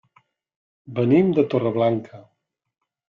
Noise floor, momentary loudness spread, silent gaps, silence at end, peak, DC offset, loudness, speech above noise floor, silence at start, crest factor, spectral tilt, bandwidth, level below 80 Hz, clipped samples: -62 dBFS; 10 LU; none; 0.95 s; -6 dBFS; under 0.1%; -20 LUFS; 42 dB; 0.9 s; 18 dB; -10 dB/octave; 5.4 kHz; -64 dBFS; under 0.1%